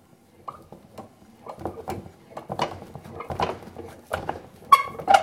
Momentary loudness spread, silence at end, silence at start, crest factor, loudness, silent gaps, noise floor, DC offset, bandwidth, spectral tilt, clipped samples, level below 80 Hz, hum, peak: 26 LU; 0 s; 0.45 s; 26 dB; -26 LUFS; none; -46 dBFS; under 0.1%; 16.5 kHz; -4 dB/octave; under 0.1%; -56 dBFS; none; 0 dBFS